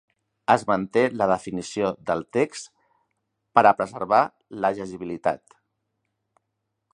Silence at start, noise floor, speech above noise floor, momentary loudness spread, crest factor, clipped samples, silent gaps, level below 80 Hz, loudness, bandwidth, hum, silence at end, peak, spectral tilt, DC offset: 0.5 s; -79 dBFS; 56 dB; 13 LU; 24 dB; under 0.1%; none; -62 dBFS; -23 LUFS; 11 kHz; none; 1.55 s; -2 dBFS; -5.5 dB/octave; under 0.1%